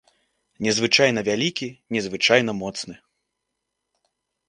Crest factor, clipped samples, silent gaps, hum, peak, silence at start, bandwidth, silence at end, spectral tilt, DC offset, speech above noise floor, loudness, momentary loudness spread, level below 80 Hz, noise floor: 24 dB; under 0.1%; none; none; 0 dBFS; 0.6 s; 11 kHz; 1.5 s; -3.5 dB/octave; under 0.1%; 58 dB; -21 LUFS; 14 LU; -62 dBFS; -80 dBFS